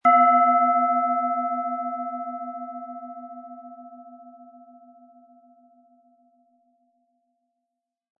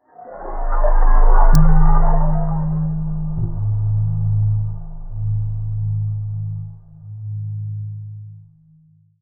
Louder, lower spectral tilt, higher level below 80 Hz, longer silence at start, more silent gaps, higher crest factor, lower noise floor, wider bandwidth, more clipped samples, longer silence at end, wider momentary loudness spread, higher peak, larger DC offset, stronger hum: about the same, -22 LUFS vs -21 LUFS; about the same, -7 dB/octave vs -7.5 dB/octave; second, -88 dBFS vs -16 dBFS; second, 0.05 s vs 0.2 s; neither; first, 20 dB vs 14 dB; first, -83 dBFS vs -52 dBFS; first, 3.1 kHz vs 2.1 kHz; neither; first, 3.75 s vs 0.85 s; first, 26 LU vs 17 LU; second, -6 dBFS vs -2 dBFS; neither; neither